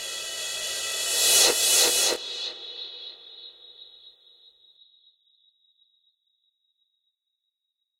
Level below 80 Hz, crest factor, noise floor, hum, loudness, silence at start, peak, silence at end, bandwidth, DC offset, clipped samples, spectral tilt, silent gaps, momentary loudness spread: -68 dBFS; 22 dB; -82 dBFS; none; -21 LUFS; 0 s; -6 dBFS; 3.9 s; 16 kHz; under 0.1%; under 0.1%; 2 dB/octave; none; 24 LU